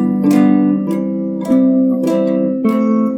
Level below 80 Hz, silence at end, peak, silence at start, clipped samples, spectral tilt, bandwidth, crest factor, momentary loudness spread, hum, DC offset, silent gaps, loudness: -58 dBFS; 0 s; 0 dBFS; 0 s; under 0.1%; -8.5 dB/octave; 13 kHz; 12 dB; 7 LU; none; under 0.1%; none; -14 LUFS